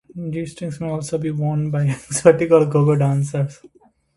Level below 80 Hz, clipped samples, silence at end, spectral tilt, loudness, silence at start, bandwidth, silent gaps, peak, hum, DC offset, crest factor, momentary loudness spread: -54 dBFS; under 0.1%; 0.5 s; -7 dB/octave; -19 LUFS; 0.15 s; 11.5 kHz; none; 0 dBFS; none; under 0.1%; 18 dB; 13 LU